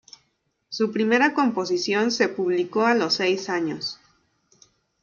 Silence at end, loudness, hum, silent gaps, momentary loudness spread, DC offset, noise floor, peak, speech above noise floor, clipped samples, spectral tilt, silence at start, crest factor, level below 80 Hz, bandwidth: 1.1 s; -22 LUFS; none; none; 10 LU; under 0.1%; -72 dBFS; -6 dBFS; 49 dB; under 0.1%; -4 dB/octave; 0.7 s; 18 dB; -72 dBFS; 7.2 kHz